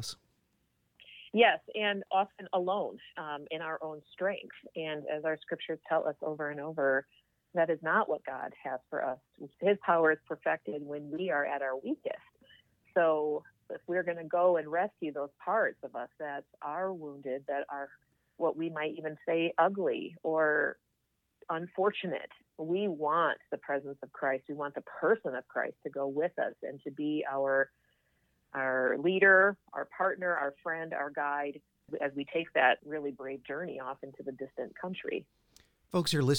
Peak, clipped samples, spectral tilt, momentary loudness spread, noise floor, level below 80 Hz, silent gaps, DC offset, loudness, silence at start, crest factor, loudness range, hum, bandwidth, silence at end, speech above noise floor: -10 dBFS; under 0.1%; -5.5 dB/octave; 13 LU; -80 dBFS; -78 dBFS; none; under 0.1%; -33 LUFS; 0 s; 22 dB; 7 LU; none; 17.5 kHz; 0 s; 47 dB